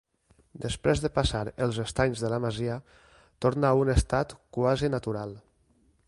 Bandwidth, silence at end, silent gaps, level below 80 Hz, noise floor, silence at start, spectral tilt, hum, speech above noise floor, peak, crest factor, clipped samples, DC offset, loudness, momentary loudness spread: 11.5 kHz; 0.7 s; none; -40 dBFS; -66 dBFS; 0.55 s; -6 dB/octave; none; 39 dB; -10 dBFS; 20 dB; under 0.1%; under 0.1%; -28 LUFS; 11 LU